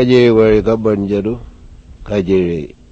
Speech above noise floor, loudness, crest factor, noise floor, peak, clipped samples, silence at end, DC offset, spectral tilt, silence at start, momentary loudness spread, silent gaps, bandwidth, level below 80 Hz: 25 dB; -14 LUFS; 14 dB; -37 dBFS; 0 dBFS; under 0.1%; 0.25 s; under 0.1%; -8 dB/octave; 0 s; 13 LU; none; 7.8 kHz; -34 dBFS